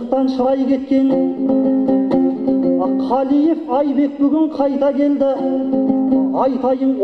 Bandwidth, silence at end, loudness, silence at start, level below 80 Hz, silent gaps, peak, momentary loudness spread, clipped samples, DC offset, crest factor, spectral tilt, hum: 5 kHz; 0 s; -16 LUFS; 0 s; -54 dBFS; none; -2 dBFS; 2 LU; under 0.1%; under 0.1%; 12 dB; -8.5 dB/octave; none